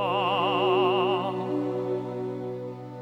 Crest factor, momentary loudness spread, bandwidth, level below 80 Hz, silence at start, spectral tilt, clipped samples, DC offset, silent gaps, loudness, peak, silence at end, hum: 16 dB; 12 LU; 7.6 kHz; -68 dBFS; 0 s; -7 dB/octave; under 0.1%; under 0.1%; none; -27 LUFS; -10 dBFS; 0 s; none